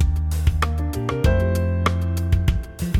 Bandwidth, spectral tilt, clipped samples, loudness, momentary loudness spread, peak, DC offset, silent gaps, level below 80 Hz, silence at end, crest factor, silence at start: 15.5 kHz; -6.5 dB/octave; under 0.1%; -22 LUFS; 5 LU; -6 dBFS; under 0.1%; none; -24 dBFS; 0 s; 14 dB; 0 s